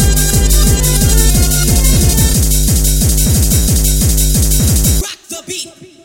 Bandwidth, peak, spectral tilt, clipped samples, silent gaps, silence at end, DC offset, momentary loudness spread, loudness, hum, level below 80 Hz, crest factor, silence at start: 18 kHz; 0 dBFS; -4 dB/octave; under 0.1%; none; 0.2 s; under 0.1%; 12 LU; -11 LUFS; none; -14 dBFS; 10 dB; 0 s